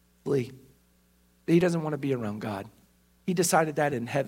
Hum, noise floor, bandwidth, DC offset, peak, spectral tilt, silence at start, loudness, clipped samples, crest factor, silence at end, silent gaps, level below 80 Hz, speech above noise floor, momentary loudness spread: 60 Hz at -55 dBFS; -64 dBFS; 16 kHz; under 0.1%; -8 dBFS; -5.5 dB/octave; 0.25 s; -28 LUFS; under 0.1%; 20 dB; 0 s; none; -66 dBFS; 37 dB; 15 LU